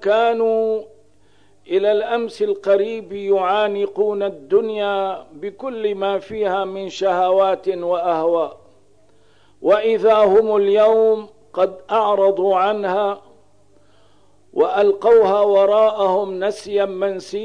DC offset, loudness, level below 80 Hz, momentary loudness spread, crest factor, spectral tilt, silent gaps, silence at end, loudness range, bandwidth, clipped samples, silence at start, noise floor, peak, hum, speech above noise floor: 0.3%; -18 LUFS; -62 dBFS; 11 LU; 12 dB; -5.5 dB/octave; none; 0 s; 4 LU; 10 kHz; under 0.1%; 0 s; -56 dBFS; -6 dBFS; 50 Hz at -65 dBFS; 39 dB